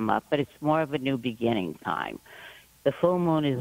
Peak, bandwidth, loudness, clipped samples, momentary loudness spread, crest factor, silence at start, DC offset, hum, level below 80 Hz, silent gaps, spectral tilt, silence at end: -8 dBFS; 16 kHz; -27 LUFS; under 0.1%; 17 LU; 18 dB; 0 s; under 0.1%; none; -62 dBFS; none; -7.5 dB/octave; 0 s